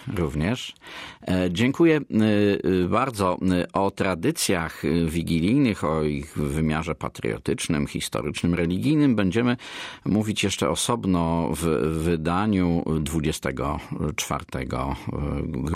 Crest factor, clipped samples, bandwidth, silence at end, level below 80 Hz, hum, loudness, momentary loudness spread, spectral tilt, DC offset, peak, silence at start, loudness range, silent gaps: 16 dB; under 0.1%; 16 kHz; 0 s; -42 dBFS; none; -24 LUFS; 9 LU; -5.5 dB/octave; under 0.1%; -8 dBFS; 0 s; 3 LU; none